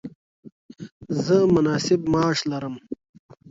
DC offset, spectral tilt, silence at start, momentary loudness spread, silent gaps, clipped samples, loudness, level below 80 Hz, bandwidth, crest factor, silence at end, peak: under 0.1%; -6 dB/octave; 0.05 s; 24 LU; 0.15-0.43 s, 0.52-0.69 s, 0.92-1.00 s; under 0.1%; -22 LUFS; -54 dBFS; 7.8 kHz; 18 dB; 0.55 s; -6 dBFS